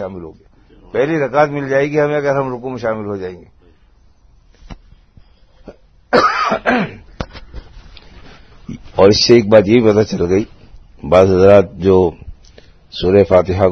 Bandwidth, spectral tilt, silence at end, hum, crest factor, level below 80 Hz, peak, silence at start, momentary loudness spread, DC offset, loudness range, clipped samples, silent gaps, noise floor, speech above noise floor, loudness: 7.4 kHz; -6 dB/octave; 0 s; none; 16 dB; -40 dBFS; 0 dBFS; 0 s; 21 LU; under 0.1%; 12 LU; 0.1%; none; -49 dBFS; 36 dB; -13 LUFS